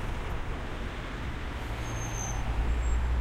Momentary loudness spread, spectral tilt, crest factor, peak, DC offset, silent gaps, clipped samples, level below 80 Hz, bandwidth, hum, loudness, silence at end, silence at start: 7 LU; -4.5 dB/octave; 14 dB; -18 dBFS; under 0.1%; none; under 0.1%; -32 dBFS; 13.5 kHz; none; -35 LUFS; 0 s; 0 s